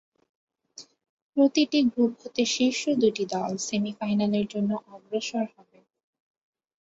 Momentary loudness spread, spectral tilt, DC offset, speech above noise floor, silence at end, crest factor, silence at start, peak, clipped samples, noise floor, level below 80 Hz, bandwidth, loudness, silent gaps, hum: 11 LU; -4.5 dB/octave; under 0.1%; 25 dB; 1.35 s; 18 dB; 0.8 s; -10 dBFS; under 0.1%; -51 dBFS; -68 dBFS; 8 kHz; -26 LUFS; 1.09-1.33 s; none